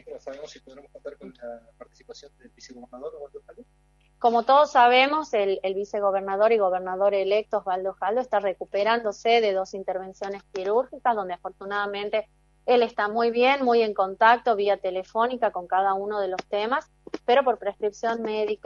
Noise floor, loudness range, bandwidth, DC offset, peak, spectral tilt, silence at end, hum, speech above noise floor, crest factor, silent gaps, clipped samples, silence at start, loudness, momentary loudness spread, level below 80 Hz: -60 dBFS; 8 LU; 7.4 kHz; under 0.1%; -4 dBFS; -4 dB/octave; 0.1 s; none; 36 dB; 20 dB; none; under 0.1%; 0.05 s; -24 LUFS; 20 LU; -64 dBFS